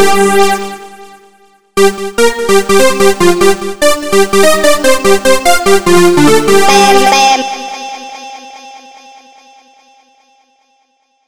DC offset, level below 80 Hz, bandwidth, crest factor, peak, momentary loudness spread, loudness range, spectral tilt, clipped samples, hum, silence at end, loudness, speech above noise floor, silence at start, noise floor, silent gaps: under 0.1%; -38 dBFS; over 20 kHz; 10 dB; 0 dBFS; 17 LU; 7 LU; -3 dB/octave; 0.5%; none; 0 s; -8 LUFS; 50 dB; 0 s; -57 dBFS; none